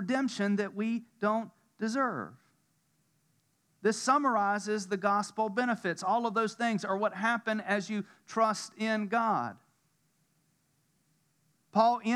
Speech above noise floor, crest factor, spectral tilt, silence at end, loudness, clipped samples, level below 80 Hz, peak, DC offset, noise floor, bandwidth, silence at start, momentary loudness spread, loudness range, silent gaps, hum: 43 dB; 20 dB; -5 dB/octave; 0 s; -31 LUFS; under 0.1%; under -90 dBFS; -12 dBFS; under 0.1%; -73 dBFS; 12.5 kHz; 0 s; 8 LU; 5 LU; none; none